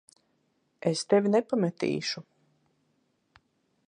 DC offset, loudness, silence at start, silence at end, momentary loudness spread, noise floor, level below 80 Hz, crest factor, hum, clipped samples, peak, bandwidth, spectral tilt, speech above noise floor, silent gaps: under 0.1%; -28 LUFS; 0.85 s; 1.65 s; 10 LU; -73 dBFS; -76 dBFS; 20 dB; none; under 0.1%; -10 dBFS; 11 kHz; -5.5 dB/octave; 46 dB; none